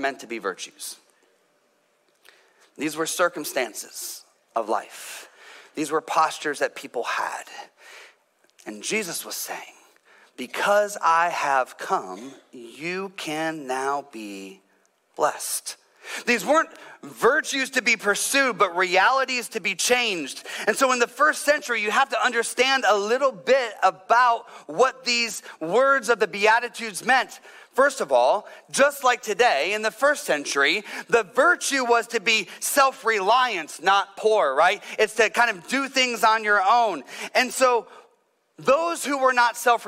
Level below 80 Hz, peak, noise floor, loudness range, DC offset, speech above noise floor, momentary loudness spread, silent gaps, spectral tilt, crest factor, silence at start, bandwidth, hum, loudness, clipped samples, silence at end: -72 dBFS; -8 dBFS; -66 dBFS; 9 LU; under 0.1%; 43 dB; 14 LU; none; -1.5 dB/octave; 16 dB; 0 s; 16 kHz; none; -22 LUFS; under 0.1%; 0 s